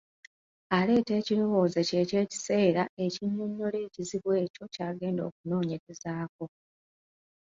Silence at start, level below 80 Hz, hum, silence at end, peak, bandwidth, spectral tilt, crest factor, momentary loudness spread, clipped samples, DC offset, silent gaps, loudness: 0.7 s; -70 dBFS; none; 1.1 s; -10 dBFS; 7.8 kHz; -6 dB/octave; 20 dB; 11 LU; under 0.1%; under 0.1%; 2.89-2.97 s, 4.50-4.54 s, 5.32-5.44 s, 5.80-5.87 s, 6.29-6.39 s; -30 LUFS